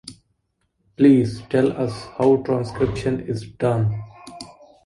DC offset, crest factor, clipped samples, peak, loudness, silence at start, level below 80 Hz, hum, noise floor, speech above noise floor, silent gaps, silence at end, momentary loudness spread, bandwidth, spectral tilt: under 0.1%; 18 dB; under 0.1%; -4 dBFS; -20 LUFS; 0.05 s; -48 dBFS; none; -71 dBFS; 51 dB; none; 0.4 s; 23 LU; 11.5 kHz; -8 dB/octave